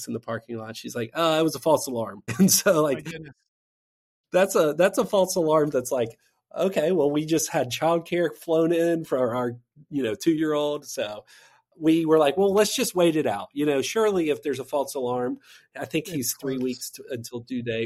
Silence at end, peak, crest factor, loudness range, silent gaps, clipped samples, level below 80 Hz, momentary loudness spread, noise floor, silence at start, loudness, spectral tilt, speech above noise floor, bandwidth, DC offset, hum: 0 s; -6 dBFS; 18 dB; 4 LU; 3.48-4.24 s; under 0.1%; -66 dBFS; 13 LU; under -90 dBFS; 0 s; -24 LUFS; -4.5 dB/octave; over 66 dB; 16 kHz; under 0.1%; none